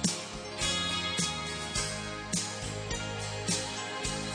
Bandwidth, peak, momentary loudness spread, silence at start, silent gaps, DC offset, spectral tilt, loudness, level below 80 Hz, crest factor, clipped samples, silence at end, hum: 10.5 kHz; -12 dBFS; 6 LU; 0 s; none; under 0.1%; -2.5 dB/octave; -32 LUFS; -50 dBFS; 22 dB; under 0.1%; 0 s; none